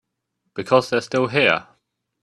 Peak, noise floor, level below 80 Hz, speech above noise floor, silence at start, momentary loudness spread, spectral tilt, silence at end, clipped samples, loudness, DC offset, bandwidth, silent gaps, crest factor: -2 dBFS; -75 dBFS; -62 dBFS; 56 dB; 0.55 s; 13 LU; -5 dB/octave; 0.6 s; under 0.1%; -19 LUFS; under 0.1%; 12 kHz; none; 20 dB